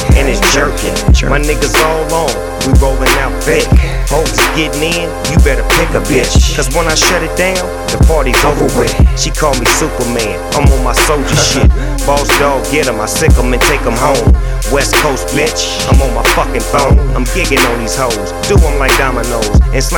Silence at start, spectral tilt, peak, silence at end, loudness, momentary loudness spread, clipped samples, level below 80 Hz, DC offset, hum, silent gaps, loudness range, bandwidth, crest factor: 0 s; -4 dB/octave; 0 dBFS; 0 s; -11 LUFS; 4 LU; 0.4%; -14 dBFS; under 0.1%; none; none; 1 LU; 20 kHz; 10 dB